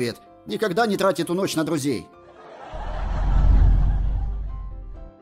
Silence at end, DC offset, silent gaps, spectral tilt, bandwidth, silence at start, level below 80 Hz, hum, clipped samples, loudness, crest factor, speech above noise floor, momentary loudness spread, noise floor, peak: 0.1 s; under 0.1%; none; -6 dB/octave; 14.5 kHz; 0 s; -24 dBFS; none; under 0.1%; -24 LUFS; 14 dB; 20 dB; 19 LU; -43 dBFS; -8 dBFS